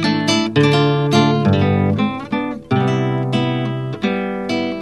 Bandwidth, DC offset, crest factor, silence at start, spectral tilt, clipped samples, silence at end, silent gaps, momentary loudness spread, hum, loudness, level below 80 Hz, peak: 11.5 kHz; 0.3%; 16 dB; 0 s; -6.5 dB/octave; under 0.1%; 0 s; none; 8 LU; none; -17 LUFS; -52 dBFS; 0 dBFS